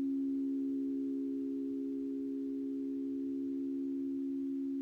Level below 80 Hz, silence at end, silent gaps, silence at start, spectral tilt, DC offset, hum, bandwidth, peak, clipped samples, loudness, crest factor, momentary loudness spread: -76 dBFS; 0 s; none; 0 s; -8.5 dB/octave; under 0.1%; none; 2.3 kHz; -30 dBFS; under 0.1%; -38 LUFS; 6 dB; 3 LU